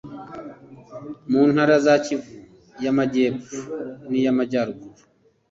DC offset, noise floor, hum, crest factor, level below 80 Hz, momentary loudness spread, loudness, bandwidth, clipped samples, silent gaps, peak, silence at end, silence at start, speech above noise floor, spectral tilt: under 0.1%; -42 dBFS; none; 18 dB; -62 dBFS; 21 LU; -21 LUFS; 7.8 kHz; under 0.1%; none; -4 dBFS; 0.6 s; 0.05 s; 21 dB; -6 dB/octave